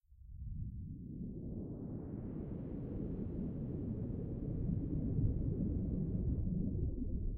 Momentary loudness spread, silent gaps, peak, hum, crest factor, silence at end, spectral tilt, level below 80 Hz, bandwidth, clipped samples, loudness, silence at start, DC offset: 9 LU; none; -22 dBFS; none; 18 dB; 0 s; -14.5 dB/octave; -44 dBFS; 2.5 kHz; under 0.1%; -41 LUFS; 0.1 s; under 0.1%